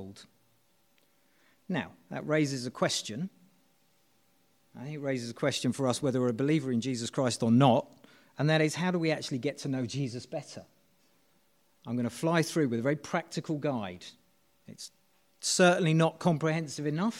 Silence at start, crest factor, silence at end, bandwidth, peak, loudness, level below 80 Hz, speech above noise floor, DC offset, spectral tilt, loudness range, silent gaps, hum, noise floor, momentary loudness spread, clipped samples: 0 s; 22 dB; 0 s; 16 kHz; -8 dBFS; -30 LUFS; -74 dBFS; 41 dB; under 0.1%; -5 dB/octave; 7 LU; none; none; -71 dBFS; 19 LU; under 0.1%